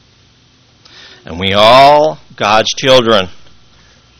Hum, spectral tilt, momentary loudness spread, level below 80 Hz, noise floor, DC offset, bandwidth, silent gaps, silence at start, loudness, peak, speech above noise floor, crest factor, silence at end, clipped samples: none; -3.5 dB/octave; 13 LU; -44 dBFS; -48 dBFS; under 0.1%; 16 kHz; none; 1.3 s; -9 LUFS; 0 dBFS; 39 dB; 12 dB; 0.8 s; 1%